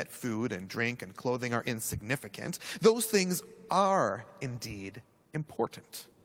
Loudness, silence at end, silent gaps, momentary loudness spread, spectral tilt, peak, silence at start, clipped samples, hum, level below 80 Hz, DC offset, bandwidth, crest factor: -32 LUFS; 0.2 s; none; 14 LU; -4.5 dB/octave; -10 dBFS; 0 s; under 0.1%; none; -64 dBFS; under 0.1%; over 20 kHz; 22 dB